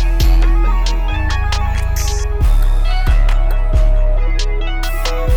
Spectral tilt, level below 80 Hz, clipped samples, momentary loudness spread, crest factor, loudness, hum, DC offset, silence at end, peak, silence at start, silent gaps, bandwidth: -5 dB/octave; -12 dBFS; under 0.1%; 5 LU; 10 dB; -17 LUFS; none; under 0.1%; 0 s; -2 dBFS; 0 s; none; 14.5 kHz